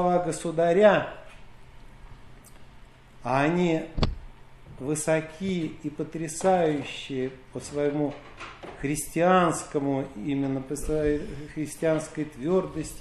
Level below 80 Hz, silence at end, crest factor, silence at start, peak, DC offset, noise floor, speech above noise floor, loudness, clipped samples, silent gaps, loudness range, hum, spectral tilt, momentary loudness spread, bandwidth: -44 dBFS; 0 s; 20 dB; 0 s; -8 dBFS; under 0.1%; -49 dBFS; 23 dB; -27 LUFS; under 0.1%; none; 3 LU; none; -5.5 dB/octave; 15 LU; 14 kHz